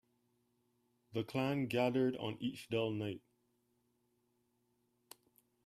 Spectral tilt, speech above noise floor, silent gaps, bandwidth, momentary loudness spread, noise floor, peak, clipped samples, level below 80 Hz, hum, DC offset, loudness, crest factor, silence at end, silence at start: -6.5 dB/octave; 43 dB; none; 15 kHz; 10 LU; -80 dBFS; -20 dBFS; under 0.1%; -78 dBFS; none; under 0.1%; -38 LUFS; 20 dB; 2.5 s; 1.15 s